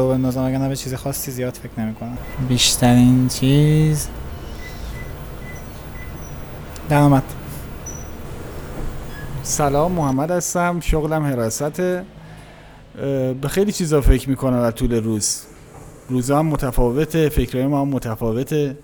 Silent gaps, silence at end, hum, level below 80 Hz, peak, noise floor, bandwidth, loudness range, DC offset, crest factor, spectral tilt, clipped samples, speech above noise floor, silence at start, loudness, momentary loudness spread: none; 0 s; none; -30 dBFS; 0 dBFS; -42 dBFS; over 20 kHz; 6 LU; under 0.1%; 20 dB; -5.5 dB/octave; under 0.1%; 24 dB; 0 s; -19 LUFS; 18 LU